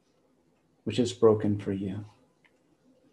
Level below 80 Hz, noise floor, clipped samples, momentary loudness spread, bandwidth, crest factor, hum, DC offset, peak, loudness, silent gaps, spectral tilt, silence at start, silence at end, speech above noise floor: -70 dBFS; -68 dBFS; under 0.1%; 17 LU; 10.5 kHz; 22 dB; none; under 0.1%; -10 dBFS; -28 LUFS; none; -6.5 dB/octave; 0.85 s; 1.05 s; 42 dB